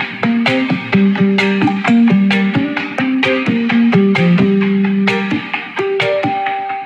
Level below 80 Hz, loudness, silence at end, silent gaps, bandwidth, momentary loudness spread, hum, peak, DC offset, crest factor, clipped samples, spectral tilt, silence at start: -56 dBFS; -14 LUFS; 0 s; none; 8.2 kHz; 7 LU; none; 0 dBFS; under 0.1%; 12 dB; under 0.1%; -7 dB/octave; 0 s